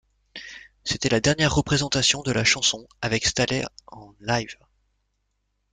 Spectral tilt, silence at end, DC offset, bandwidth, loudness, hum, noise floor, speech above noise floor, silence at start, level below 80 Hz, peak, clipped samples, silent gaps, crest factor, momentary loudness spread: -3 dB/octave; 1.2 s; under 0.1%; 9.6 kHz; -22 LUFS; 50 Hz at -55 dBFS; -74 dBFS; 50 dB; 0.35 s; -46 dBFS; -6 dBFS; under 0.1%; none; 20 dB; 19 LU